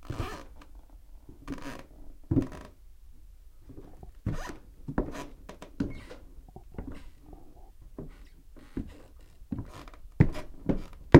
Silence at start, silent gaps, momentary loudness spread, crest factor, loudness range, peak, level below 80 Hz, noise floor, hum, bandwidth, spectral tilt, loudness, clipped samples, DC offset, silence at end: 0 s; none; 25 LU; 32 dB; 10 LU; 0 dBFS; -42 dBFS; -50 dBFS; none; 16 kHz; -8 dB/octave; -36 LUFS; under 0.1%; under 0.1%; 0 s